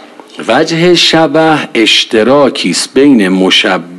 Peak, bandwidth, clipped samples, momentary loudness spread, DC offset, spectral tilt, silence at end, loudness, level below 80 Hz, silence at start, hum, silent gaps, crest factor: 0 dBFS; 12.5 kHz; 0.9%; 5 LU; under 0.1%; -4 dB/octave; 0 s; -7 LUFS; -50 dBFS; 0.35 s; none; none; 8 dB